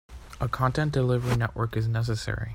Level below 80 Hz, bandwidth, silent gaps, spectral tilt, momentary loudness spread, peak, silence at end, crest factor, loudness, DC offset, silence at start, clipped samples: -42 dBFS; 16 kHz; none; -6.5 dB/octave; 7 LU; -10 dBFS; 0 s; 16 dB; -27 LUFS; under 0.1%; 0.1 s; under 0.1%